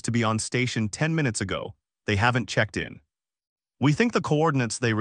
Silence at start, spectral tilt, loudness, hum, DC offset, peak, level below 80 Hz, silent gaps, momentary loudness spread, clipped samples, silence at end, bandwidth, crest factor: 0.05 s; -5 dB/octave; -25 LUFS; none; under 0.1%; -8 dBFS; -56 dBFS; 3.47-3.56 s; 10 LU; under 0.1%; 0 s; 10 kHz; 18 dB